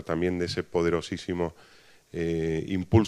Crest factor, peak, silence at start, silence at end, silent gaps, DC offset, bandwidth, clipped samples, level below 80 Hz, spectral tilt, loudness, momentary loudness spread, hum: 20 dB; -8 dBFS; 0 s; 0 s; none; under 0.1%; 12 kHz; under 0.1%; -50 dBFS; -7 dB/octave; -29 LUFS; 6 LU; none